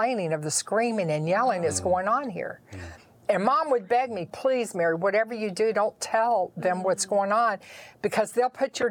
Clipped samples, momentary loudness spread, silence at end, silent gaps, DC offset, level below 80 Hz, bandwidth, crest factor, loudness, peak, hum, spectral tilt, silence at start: under 0.1%; 11 LU; 0 s; none; under 0.1%; -68 dBFS; 19 kHz; 18 dB; -26 LUFS; -8 dBFS; none; -4 dB/octave; 0 s